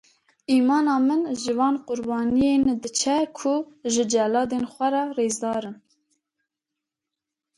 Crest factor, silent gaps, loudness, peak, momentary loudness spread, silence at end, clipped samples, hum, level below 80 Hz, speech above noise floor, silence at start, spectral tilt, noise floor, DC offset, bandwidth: 14 dB; none; -23 LUFS; -10 dBFS; 7 LU; 1.85 s; under 0.1%; none; -60 dBFS; 64 dB; 0.5 s; -3.5 dB/octave; -86 dBFS; under 0.1%; 11.5 kHz